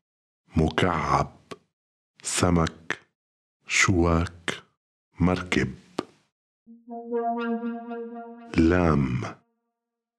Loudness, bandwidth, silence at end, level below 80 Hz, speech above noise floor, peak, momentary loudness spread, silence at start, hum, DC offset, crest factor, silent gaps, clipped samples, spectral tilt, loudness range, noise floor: -25 LUFS; 13.5 kHz; 0.85 s; -42 dBFS; 60 dB; -6 dBFS; 18 LU; 0.55 s; none; under 0.1%; 20 dB; 1.73-2.14 s, 3.15-3.60 s, 4.77-5.11 s, 6.32-6.66 s; under 0.1%; -5 dB/octave; 4 LU; -85 dBFS